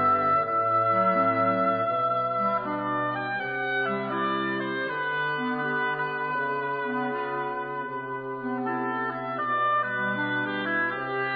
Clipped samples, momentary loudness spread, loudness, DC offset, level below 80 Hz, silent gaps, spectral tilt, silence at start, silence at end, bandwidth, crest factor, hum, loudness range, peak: under 0.1%; 7 LU; -26 LUFS; under 0.1%; -68 dBFS; none; -8.5 dB/octave; 0 s; 0 s; 5 kHz; 14 dB; none; 5 LU; -12 dBFS